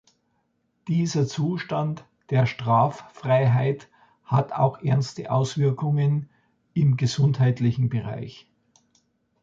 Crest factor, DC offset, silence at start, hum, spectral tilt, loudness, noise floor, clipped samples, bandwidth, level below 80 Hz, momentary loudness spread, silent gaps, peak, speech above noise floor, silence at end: 18 dB; under 0.1%; 0.85 s; none; -7 dB/octave; -24 LUFS; -71 dBFS; under 0.1%; 7.6 kHz; -60 dBFS; 10 LU; none; -6 dBFS; 49 dB; 1.05 s